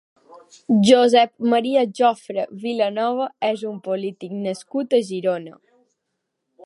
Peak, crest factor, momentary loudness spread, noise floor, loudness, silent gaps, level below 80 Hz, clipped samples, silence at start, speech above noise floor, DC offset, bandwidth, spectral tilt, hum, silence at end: -2 dBFS; 20 dB; 13 LU; -77 dBFS; -20 LUFS; none; -72 dBFS; under 0.1%; 0.35 s; 58 dB; under 0.1%; 11.5 kHz; -5.5 dB/octave; none; 1.15 s